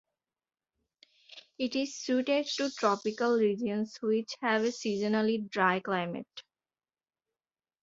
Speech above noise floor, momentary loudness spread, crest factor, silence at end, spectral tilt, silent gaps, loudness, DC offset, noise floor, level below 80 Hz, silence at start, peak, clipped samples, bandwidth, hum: over 60 dB; 8 LU; 20 dB; 1.4 s; -4.5 dB/octave; none; -30 LUFS; under 0.1%; under -90 dBFS; -76 dBFS; 1.35 s; -12 dBFS; under 0.1%; 7.8 kHz; none